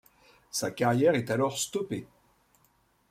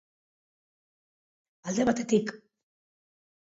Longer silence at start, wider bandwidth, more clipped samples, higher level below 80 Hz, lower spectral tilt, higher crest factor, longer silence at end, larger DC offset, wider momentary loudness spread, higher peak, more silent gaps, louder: second, 0.55 s vs 1.65 s; first, 16 kHz vs 8 kHz; neither; about the same, -68 dBFS vs -68 dBFS; about the same, -4.5 dB/octave vs -5 dB/octave; about the same, 20 dB vs 22 dB; about the same, 1.05 s vs 1.05 s; neither; about the same, 11 LU vs 13 LU; about the same, -10 dBFS vs -10 dBFS; neither; about the same, -29 LUFS vs -28 LUFS